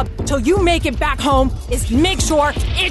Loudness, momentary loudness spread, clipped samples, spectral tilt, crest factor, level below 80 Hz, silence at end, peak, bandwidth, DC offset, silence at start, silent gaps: -16 LUFS; 4 LU; under 0.1%; -4.5 dB/octave; 14 dB; -22 dBFS; 0 s; -2 dBFS; 12.5 kHz; under 0.1%; 0 s; none